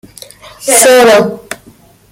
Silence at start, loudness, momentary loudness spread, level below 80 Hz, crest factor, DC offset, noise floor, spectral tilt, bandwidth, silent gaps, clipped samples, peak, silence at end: 0.6 s; -6 LUFS; 22 LU; -50 dBFS; 10 dB; under 0.1%; -41 dBFS; -2 dB/octave; over 20 kHz; none; 0.3%; 0 dBFS; 0.55 s